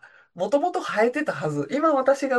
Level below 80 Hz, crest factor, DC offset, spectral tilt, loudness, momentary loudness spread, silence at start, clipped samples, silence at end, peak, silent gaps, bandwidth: -72 dBFS; 16 dB; under 0.1%; -5.5 dB/octave; -23 LUFS; 6 LU; 0.05 s; under 0.1%; 0 s; -8 dBFS; none; 12 kHz